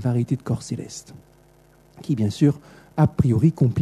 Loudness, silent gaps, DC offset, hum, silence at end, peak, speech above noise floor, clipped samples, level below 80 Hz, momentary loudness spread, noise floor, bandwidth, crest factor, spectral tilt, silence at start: -22 LUFS; none; under 0.1%; 50 Hz at -45 dBFS; 0 s; -6 dBFS; 33 dB; under 0.1%; -48 dBFS; 16 LU; -54 dBFS; 12.5 kHz; 16 dB; -8 dB/octave; 0 s